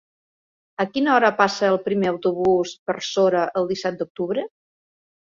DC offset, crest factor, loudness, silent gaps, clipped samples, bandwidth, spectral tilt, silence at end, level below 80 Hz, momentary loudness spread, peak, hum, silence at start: under 0.1%; 20 dB; -21 LUFS; 2.79-2.86 s, 4.10-4.15 s; under 0.1%; 7.6 kHz; -5 dB/octave; 0.9 s; -64 dBFS; 10 LU; -2 dBFS; none; 0.8 s